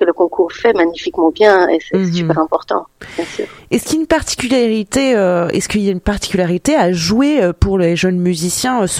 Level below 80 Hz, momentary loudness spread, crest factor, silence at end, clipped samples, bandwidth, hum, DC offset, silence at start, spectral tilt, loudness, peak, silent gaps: -34 dBFS; 7 LU; 14 dB; 0 s; under 0.1%; 16 kHz; none; under 0.1%; 0 s; -5 dB/octave; -14 LUFS; 0 dBFS; none